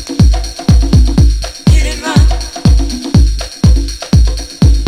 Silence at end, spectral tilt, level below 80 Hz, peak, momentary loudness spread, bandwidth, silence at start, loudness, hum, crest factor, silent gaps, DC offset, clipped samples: 0 s; -6 dB/octave; -12 dBFS; 0 dBFS; 5 LU; 13.5 kHz; 0 s; -12 LUFS; none; 10 dB; none; under 0.1%; 0.3%